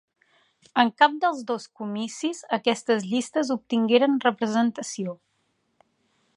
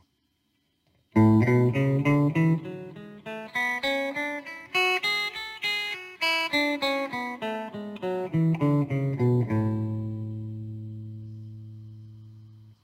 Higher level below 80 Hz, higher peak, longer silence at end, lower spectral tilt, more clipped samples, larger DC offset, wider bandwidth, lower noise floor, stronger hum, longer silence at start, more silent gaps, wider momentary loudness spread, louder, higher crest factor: second, -78 dBFS vs -60 dBFS; first, -4 dBFS vs -10 dBFS; first, 1.25 s vs 0.15 s; second, -4 dB/octave vs -6.5 dB/octave; neither; neither; second, 11.5 kHz vs 16 kHz; about the same, -72 dBFS vs -73 dBFS; neither; second, 0.75 s vs 1.15 s; neither; second, 12 LU vs 18 LU; about the same, -24 LUFS vs -26 LUFS; about the same, 22 dB vs 18 dB